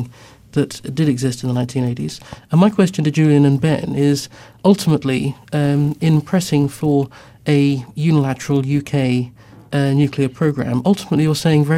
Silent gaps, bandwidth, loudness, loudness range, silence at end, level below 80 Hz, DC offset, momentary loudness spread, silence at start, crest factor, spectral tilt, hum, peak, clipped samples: none; 15 kHz; -17 LUFS; 2 LU; 0 s; -50 dBFS; under 0.1%; 8 LU; 0 s; 16 dB; -7 dB/octave; none; -2 dBFS; under 0.1%